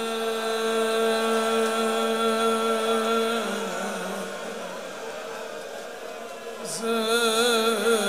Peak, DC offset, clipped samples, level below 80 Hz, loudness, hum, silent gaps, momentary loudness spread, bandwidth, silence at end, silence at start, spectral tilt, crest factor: -10 dBFS; 0.3%; under 0.1%; -74 dBFS; -25 LUFS; none; none; 14 LU; 16 kHz; 0 s; 0 s; -2.5 dB/octave; 16 dB